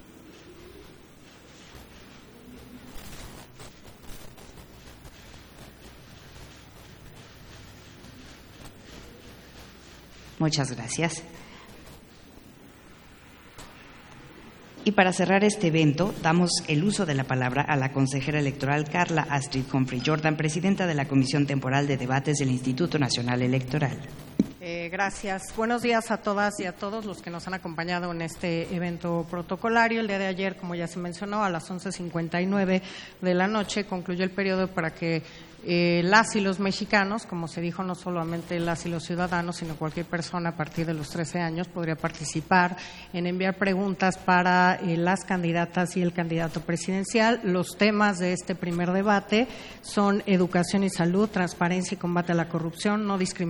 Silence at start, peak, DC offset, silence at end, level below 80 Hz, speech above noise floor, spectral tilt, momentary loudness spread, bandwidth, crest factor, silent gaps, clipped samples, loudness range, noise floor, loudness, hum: 0.1 s; -2 dBFS; under 0.1%; 0 s; -54 dBFS; 24 dB; -5.5 dB/octave; 24 LU; over 20 kHz; 24 dB; none; under 0.1%; 22 LU; -50 dBFS; -26 LUFS; none